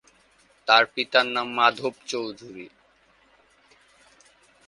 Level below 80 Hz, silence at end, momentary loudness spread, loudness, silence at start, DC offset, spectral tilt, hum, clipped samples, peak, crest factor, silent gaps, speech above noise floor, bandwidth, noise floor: -72 dBFS; 2 s; 21 LU; -22 LUFS; 0.65 s; under 0.1%; -2.5 dB/octave; none; under 0.1%; -2 dBFS; 26 dB; none; 37 dB; 11.5 kHz; -61 dBFS